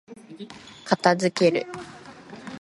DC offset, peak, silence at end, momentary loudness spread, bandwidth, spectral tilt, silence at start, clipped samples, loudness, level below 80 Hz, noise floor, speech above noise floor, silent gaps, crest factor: under 0.1%; -4 dBFS; 0 s; 22 LU; 11.5 kHz; -5 dB/octave; 0.1 s; under 0.1%; -22 LUFS; -68 dBFS; -43 dBFS; 20 dB; none; 22 dB